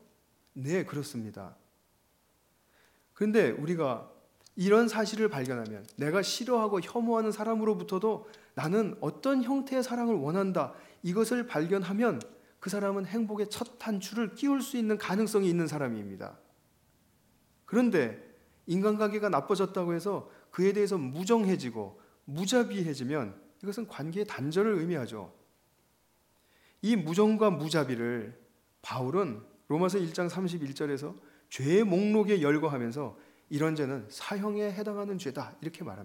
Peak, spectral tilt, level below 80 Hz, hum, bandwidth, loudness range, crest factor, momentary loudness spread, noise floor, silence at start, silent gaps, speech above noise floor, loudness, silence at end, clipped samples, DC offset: -12 dBFS; -6 dB/octave; -78 dBFS; none; 17 kHz; 4 LU; 20 dB; 14 LU; -70 dBFS; 0.55 s; none; 40 dB; -31 LUFS; 0 s; under 0.1%; under 0.1%